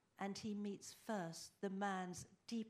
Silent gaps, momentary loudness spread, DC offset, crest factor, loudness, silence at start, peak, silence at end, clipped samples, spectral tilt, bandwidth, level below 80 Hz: none; 7 LU; under 0.1%; 18 dB; -47 LUFS; 0.2 s; -30 dBFS; 0 s; under 0.1%; -5 dB/octave; 15.5 kHz; -84 dBFS